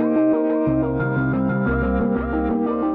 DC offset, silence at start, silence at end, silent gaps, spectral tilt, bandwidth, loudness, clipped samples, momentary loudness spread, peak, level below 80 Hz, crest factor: under 0.1%; 0 s; 0 s; none; -12.5 dB/octave; 4 kHz; -21 LUFS; under 0.1%; 3 LU; -10 dBFS; -34 dBFS; 10 dB